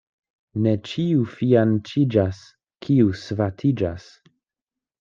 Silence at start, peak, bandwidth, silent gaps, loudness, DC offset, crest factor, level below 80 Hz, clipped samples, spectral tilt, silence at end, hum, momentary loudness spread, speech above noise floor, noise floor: 0.55 s; -4 dBFS; 7.6 kHz; none; -22 LUFS; under 0.1%; 18 dB; -58 dBFS; under 0.1%; -8.5 dB/octave; 1 s; none; 11 LU; 68 dB; -89 dBFS